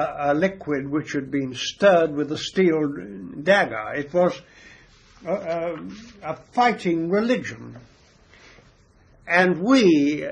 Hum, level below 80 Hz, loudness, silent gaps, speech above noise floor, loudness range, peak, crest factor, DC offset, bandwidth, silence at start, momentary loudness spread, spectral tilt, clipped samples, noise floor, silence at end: none; -58 dBFS; -22 LUFS; none; 33 dB; 4 LU; -4 dBFS; 18 dB; under 0.1%; 9.6 kHz; 0 s; 17 LU; -5.5 dB/octave; under 0.1%; -55 dBFS; 0 s